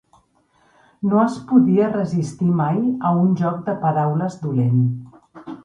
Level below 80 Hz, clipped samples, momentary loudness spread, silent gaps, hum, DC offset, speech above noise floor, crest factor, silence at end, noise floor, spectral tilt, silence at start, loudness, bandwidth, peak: -60 dBFS; under 0.1%; 7 LU; none; none; under 0.1%; 42 dB; 18 dB; 0.05 s; -60 dBFS; -9.5 dB/octave; 1 s; -19 LUFS; 10 kHz; -2 dBFS